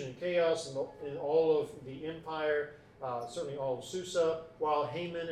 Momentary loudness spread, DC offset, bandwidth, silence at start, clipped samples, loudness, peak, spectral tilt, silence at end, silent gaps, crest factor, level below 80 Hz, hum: 12 LU; under 0.1%; 12.5 kHz; 0 s; under 0.1%; -34 LUFS; -18 dBFS; -5 dB/octave; 0 s; none; 16 dB; -68 dBFS; none